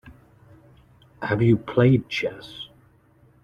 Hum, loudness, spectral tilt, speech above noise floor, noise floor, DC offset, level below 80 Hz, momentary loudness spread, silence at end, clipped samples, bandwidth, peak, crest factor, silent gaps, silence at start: none; -22 LUFS; -8 dB/octave; 36 dB; -57 dBFS; under 0.1%; -54 dBFS; 20 LU; 0.8 s; under 0.1%; 7 kHz; -4 dBFS; 20 dB; none; 0.05 s